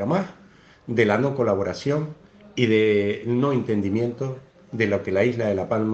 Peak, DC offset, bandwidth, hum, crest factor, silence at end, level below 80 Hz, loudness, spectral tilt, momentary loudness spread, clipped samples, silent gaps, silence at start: -4 dBFS; under 0.1%; 8 kHz; none; 18 dB; 0 s; -62 dBFS; -23 LUFS; -7 dB/octave; 14 LU; under 0.1%; none; 0 s